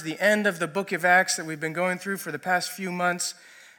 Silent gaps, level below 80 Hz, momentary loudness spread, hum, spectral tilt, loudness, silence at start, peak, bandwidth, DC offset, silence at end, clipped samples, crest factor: none; -82 dBFS; 11 LU; none; -3 dB/octave; -25 LUFS; 0 s; -8 dBFS; 17.5 kHz; under 0.1%; 0.15 s; under 0.1%; 18 dB